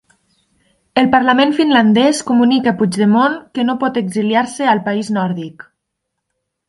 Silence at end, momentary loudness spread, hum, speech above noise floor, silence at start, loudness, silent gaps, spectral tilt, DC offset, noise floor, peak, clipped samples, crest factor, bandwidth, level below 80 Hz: 1.05 s; 8 LU; none; 62 dB; 0.95 s; -14 LUFS; none; -5 dB/octave; under 0.1%; -75 dBFS; 0 dBFS; under 0.1%; 16 dB; 11.5 kHz; -58 dBFS